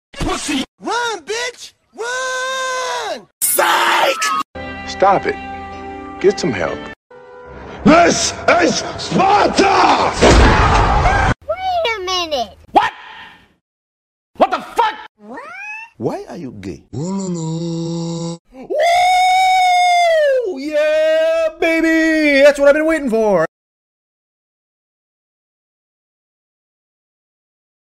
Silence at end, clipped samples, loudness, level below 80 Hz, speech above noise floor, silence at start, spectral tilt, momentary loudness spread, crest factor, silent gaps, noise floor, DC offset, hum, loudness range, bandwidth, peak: 4.5 s; under 0.1%; -15 LUFS; -30 dBFS; 25 dB; 0.15 s; -4 dB/octave; 18 LU; 16 dB; 0.68-0.78 s, 3.33-3.41 s, 4.45-4.54 s, 6.96-7.10 s, 13.61-14.34 s, 15.09-15.15 s, 18.39-18.45 s; -39 dBFS; under 0.1%; none; 10 LU; 16 kHz; 0 dBFS